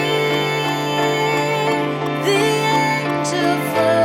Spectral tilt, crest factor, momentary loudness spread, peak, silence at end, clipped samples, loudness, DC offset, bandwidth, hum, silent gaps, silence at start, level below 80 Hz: -4.5 dB/octave; 12 dB; 3 LU; -4 dBFS; 0 s; under 0.1%; -18 LUFS; under 0.1%; 16.5 kHz; none; none; 0 s; -60 dBFS